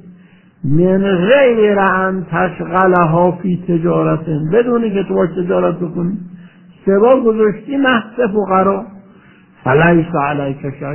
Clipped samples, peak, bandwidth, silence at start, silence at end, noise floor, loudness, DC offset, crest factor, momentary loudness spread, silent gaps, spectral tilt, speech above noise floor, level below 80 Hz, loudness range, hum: under 0.1%; 0 dBFS; 3.2 kHz; 0.05 s; 0 s; -44 dBFS; -14 LUFS; under 0.1%; 14 dB; 10 LU; none; -11 dB/octave; 31 dB; -44 dBFS; 3 LU; none